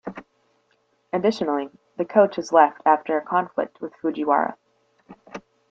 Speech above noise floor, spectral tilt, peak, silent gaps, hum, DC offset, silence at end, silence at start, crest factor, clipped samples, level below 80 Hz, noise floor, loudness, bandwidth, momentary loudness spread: 45 dB; -6 dB/octave; -2 dBFS; none; none; under 0.1%; 0.3 s; 0.05 s; 20 dB; under 0.1%; -70 dBFS; -67 dBFS; -22 LUFS; 7.8 kHz; 22 LU